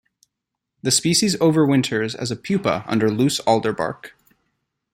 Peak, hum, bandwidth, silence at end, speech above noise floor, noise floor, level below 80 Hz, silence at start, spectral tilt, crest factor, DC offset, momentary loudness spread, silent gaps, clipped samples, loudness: -2 dBFS; none; 16.5 kHz; 0.85 s; 62 dB; -82 dBFS; -58 dBFS; 0.85 s; -4.5 dB/octave; 18 dB; under 0.1%; 11 LU; none; under 0.1%; -19 LUFS